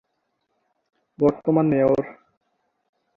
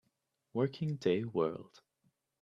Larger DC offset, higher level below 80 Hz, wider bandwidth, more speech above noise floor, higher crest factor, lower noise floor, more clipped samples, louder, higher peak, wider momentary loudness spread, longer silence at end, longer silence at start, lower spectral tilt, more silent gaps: neither; first, -58 dBFS vs -76 dBFS; second, 6.6 kHz vs 7.6 kHz; first, 55 dB vs 47 dB; about the same, 18 dB vs 20 dB; second, -74 dBFS vs -82 dBFS; neither; first, -21 LUFS vs -35 LUFS; first, -6 dBFS vs -16 dBFS; about the same, 6 LU vs 8 LU; first, 1.05 s vs 0.8 s; first, 1.2 s vs 0.55 s; first, -10.5 dB/octave vs -8 dB/octave; neither